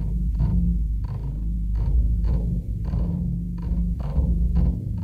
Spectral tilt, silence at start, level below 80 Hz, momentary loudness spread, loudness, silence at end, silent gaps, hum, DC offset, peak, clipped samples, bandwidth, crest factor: -10.5 dB/octave; 0 s; -24 dBFS; 6 LU; -25 LUFS; 0 s; none; none; under 0.1%; -10 dBFS; under 0.1%; 1.8 kHz; 12 dB